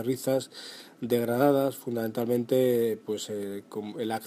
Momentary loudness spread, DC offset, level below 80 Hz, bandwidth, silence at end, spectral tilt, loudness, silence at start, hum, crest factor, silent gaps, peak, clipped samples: 14 LU; under 0.1%; -74 dBFS; 15.5 kHz; 0 s; -5.5 dB/octave; -28 LUFS; 0 s; none; 18 dB; none; -10 dBFS; under 0.1%